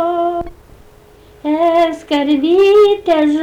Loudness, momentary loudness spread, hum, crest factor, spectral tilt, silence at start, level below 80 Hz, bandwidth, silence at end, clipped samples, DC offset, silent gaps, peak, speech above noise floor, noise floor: -13 LUFS; 13 LU; none; 10 dB; -5 dB/octave; 0 s; -44 dBFS; 10.5 kHz; 0 s; under 0.1%; under 0.1%; none; -4 dBFS; 32 dB; -43 dBFS